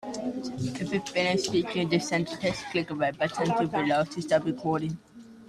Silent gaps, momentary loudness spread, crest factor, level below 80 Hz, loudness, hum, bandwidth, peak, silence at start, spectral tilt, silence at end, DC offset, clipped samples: none; 7 LU; 16 dB; -62 dBFS; -28 LUFS; none; 13.5 kHz; -12 dBFS; 0 s; -5 dB/octave; 0 s; under 0.1%; under 0.1%